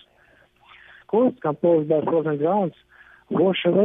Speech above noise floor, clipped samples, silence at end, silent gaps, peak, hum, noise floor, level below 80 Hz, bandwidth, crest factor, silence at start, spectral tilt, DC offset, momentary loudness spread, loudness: 37 dB; under 0.1%; 0 s; none; -6 dBFS; none; -57 dBFS; -66 dBFS; 3.8 kHz; 16 dB; 1.15 s; -10 dB/octave; under 0.1%; 6 LU; -22 LUFS